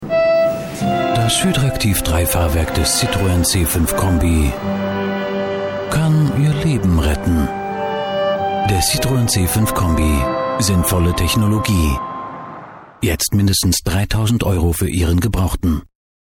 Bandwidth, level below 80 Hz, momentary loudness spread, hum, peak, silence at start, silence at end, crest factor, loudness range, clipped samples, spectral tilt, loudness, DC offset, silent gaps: 17.5 kHz; -26 dBFS; 6 LU; none; -2 dBFS; 0 s; 0.55 s; 14 dB; 2 LU; under 0.1%; -5 dB/octave; -17 LUFS; under 0.1%; none